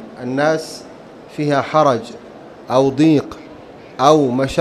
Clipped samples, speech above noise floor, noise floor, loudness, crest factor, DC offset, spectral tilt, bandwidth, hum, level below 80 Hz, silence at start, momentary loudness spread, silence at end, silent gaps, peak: under 0.1%; 22 dB; -38 dBFS; -16 LUFS; 18 dB; under 0.1%; -6 dB/octave; 13 kHz; none; -48 dBFS; 0 s; 22 LU; 0 s; none; 0 dBFS